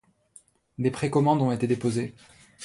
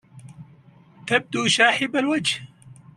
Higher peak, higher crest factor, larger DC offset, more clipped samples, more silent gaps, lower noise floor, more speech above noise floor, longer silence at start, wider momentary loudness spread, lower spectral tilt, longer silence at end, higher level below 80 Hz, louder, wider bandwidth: second, -10 dBFS vs -4 dBFS; about the same, 18 dB vs 22 dB; neither; neither; neither; first, -57 dBFS vs -51 dBFS; about the same, 32 dB vs 30 dB; first, 0.8 s vs 0.15 s; about the same, 11 LU vs 10 LU; first, -7 dB/octave vs -3 dB/octave; second, 0 s vs 0.25 s; about the same, -62 dBFS vs -66 dBFS; second, -25 LUFS vs -21 LUFS; second, 11.5 kHz vs 13 kHz